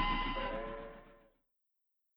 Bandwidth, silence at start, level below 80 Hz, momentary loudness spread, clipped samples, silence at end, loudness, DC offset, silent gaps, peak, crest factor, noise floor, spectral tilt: over 20 kHz; 0 s; -46 dBFS; 17 LU; under 0.1%; 1 s; -39 LUFS; under 0.1%; none; -22 dBFS; 18 dB; -80 dBFS; -7 dB/octave